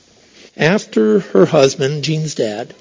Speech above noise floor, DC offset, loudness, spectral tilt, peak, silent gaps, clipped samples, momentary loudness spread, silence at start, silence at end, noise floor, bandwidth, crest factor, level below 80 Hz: 31 dB; under 0.1%; -15 LUFS; -5.5 dB/octave; 0 dBFS; none; under 0.1%; 8 LU; 0.6 s; 0.15 s; -45 dBFS; 7.6 kHz; 16 dB; -58 dBFS